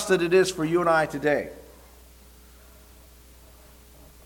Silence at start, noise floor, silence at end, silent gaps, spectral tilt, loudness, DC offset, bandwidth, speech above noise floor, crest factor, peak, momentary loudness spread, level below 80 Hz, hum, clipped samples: 0 s; -51 dBFS; 2.65 s; none; -5 dB/octave; -23 LUFS; under 0.1%; 19 kHz; 28 dB; 20 dB; -8 dBFS; 13 LU; -52 dBFS; none; under 0.1%